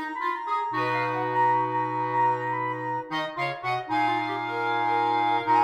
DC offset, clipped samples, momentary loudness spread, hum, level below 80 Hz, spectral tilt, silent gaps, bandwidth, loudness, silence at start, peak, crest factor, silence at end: under 0.1%; under 0.1%; 6 LU; none; -76 dBFS; -6 dB/octave; none; 10.5 kHz; -26 LUFS; 0 s; -12 dBFS; 14 dB; 0 s